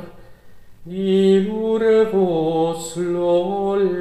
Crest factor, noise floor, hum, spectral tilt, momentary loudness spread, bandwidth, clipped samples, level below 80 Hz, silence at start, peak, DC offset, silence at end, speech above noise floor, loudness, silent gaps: 14 dB; -43 dBFS; none; -6.5 dB/octave; 8 LU; 13 kHz; under 0.1%; -52 dBFS; 0 s; -6 dBFS; 0.6%; 0 s; 25 dB; -18 LUFS; none